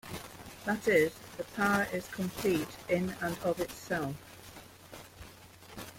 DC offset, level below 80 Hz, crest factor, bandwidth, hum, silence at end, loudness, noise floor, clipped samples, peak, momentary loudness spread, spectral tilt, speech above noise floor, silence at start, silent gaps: under 0.1%; -60 dBFS; 20 dB; 16.5 kHz; none; 0 s; -32 LUFS; -53 dBFS; under 0.1%; -14 dBFS; 22 LU; -5 dB/octave; 21 dB; 0.05 s; none